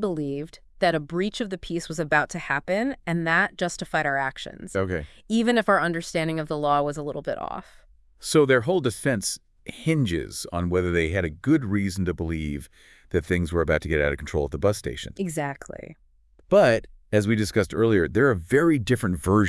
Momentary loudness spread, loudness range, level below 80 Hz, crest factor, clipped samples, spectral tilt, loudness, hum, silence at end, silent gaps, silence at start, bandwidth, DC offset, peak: 11 LU; 4 LU; -46 dBFS; 18 dB; under 0.1%; -5.5 dB/octave; -24 LUFS; none; 0 s; none; 0 s; 12 kHz; under 0.1%; -6 dBFS